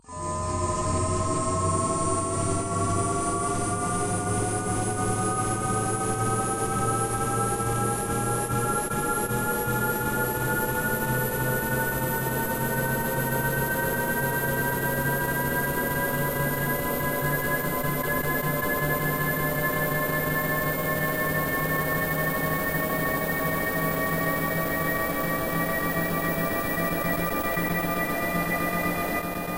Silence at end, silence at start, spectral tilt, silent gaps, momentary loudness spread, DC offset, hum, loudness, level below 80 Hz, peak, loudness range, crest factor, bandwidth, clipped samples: 0 s; 0.1 s; -4.5 dB/octave; none; 1 LU; under 0.1%; none; -26 LUFS; -44 dBFS; -12 dBFS; 1 LU; 14 dB; 16 kHz; under 0.1%